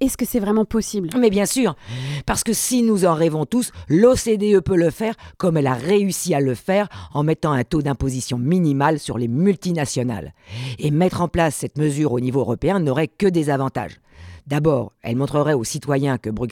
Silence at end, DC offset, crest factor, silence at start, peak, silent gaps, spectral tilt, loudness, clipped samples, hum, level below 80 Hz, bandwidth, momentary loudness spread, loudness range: 0 s; under 0.1%; 16 dB; 0 s; -2 dBFS; none; -6 dB/octave; -20 LUFS; under 0.1%; none; -44 dBFS; 17.5 kHz; 8 LU; 3 LU